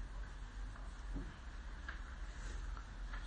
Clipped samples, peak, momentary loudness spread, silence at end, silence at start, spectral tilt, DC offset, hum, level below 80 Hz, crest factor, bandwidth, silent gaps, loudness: under 0.1%; -32 dBFS; 3 LU; 0 s; 0 s; -5 dB/octave; under 0.1%; none; -48 dBFS; 14 dB; 9.6 kHz; none; -51 LUFS